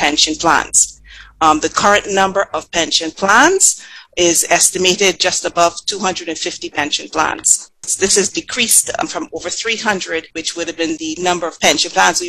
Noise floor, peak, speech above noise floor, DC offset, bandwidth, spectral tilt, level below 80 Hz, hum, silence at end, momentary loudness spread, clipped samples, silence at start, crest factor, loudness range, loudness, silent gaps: -39 dBFS; 0 dBFS; 24 dB; under 0.1%; 16 kHz; -1 dB/octave; -48 dBFS; none; 0 s; 10 LU; under 0.1%; 0 s; 16 dB; 4 LU; -14 LUFS; none